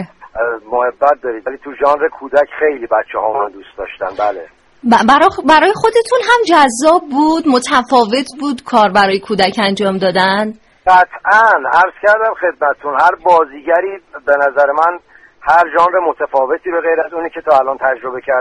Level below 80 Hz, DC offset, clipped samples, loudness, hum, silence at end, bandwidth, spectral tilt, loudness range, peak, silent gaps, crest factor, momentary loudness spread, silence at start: -48 dBFS; under 0.1%; under 0.1%; -13 LUFS; none; 0 s; 11.5 kHz; -4 dB/octave; 5 LU; 0 dBFS; none; 12 dB; 11 LU; 0 s